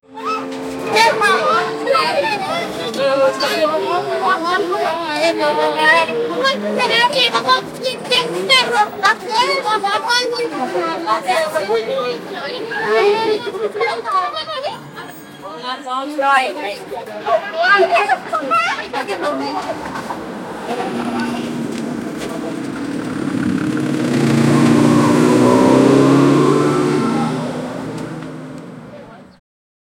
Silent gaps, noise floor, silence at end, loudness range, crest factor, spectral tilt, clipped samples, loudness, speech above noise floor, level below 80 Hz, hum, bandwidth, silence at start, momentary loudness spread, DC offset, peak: none; -37 dBFS; 0.75 s; 9 LU; 16 dB; -4.5 dB/octave; under 0.1%; -16 LUFS; 20 dB; -56 dBFS; none; 17 kHz; 0.1 s; 14 LU; under 0.1%; 0 dBFS